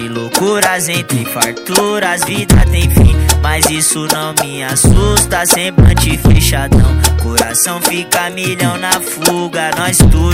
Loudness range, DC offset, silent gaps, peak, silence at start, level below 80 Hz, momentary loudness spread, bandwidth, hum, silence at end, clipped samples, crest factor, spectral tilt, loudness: 2 LU; under 0.1%; none; 0 dBFS; 0 s; -18 dBFS; 5 LU; over 20 kHz; none; 0 s; 1%; 10 dB; -4 dB/octave; -11 LUFS